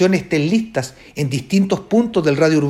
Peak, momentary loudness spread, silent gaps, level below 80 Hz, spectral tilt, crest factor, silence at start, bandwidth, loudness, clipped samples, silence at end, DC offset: -2 dBFS; 9 LU; none; -52 dBFS; -6.5 dB/octave; 16 dB; 0 s; 15 kHz; -18 LUFS; under 0.1%; 0 s; under 0.1%